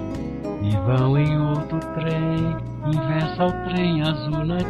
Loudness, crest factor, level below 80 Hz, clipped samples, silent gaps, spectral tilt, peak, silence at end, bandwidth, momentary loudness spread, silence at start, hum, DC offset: -23 LUFS; 14 dB; -40 dBFS; under 0.1%; none; -8.5 dB/octave; -8 dBFS; 0 s; 7.8 kHz; 8 LU; 0 s; none; under 0.1%